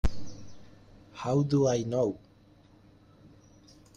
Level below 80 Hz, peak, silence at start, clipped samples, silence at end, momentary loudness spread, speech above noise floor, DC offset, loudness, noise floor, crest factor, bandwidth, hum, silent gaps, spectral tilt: -44 dBFS; -16 dBFS; 0.05 s; under 0.1%; 1.8 s; 23 LU; 31 dB; under 0.1%; -29 LUFS; -58 dBFS; 16 dB; 9.2 kHz; none; none; -7 dB/octave